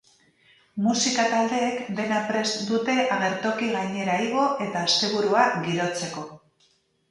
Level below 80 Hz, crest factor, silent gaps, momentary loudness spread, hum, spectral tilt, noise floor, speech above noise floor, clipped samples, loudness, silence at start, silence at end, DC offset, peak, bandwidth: -70 dBFS; 20 dB; none; 7 LU; none; -3.5 dB/octave; -65 dBFS; 41 dB; under 0.1%; -24 LUFS; 0.75 s; 0.75 s; under 0.1%; -6 dBFS; 11.5 kHz